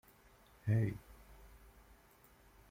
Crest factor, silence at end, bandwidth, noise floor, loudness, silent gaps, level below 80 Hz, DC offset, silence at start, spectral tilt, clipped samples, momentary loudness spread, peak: 20 dB; 1.15 s; 16 kHz; -65 dBFS; -38 LUFS; none; -62 dBFS; under 0.1%; 0.65 s; -8.5 dB/octave; under 0.1%; 26 LU; -22 dBFS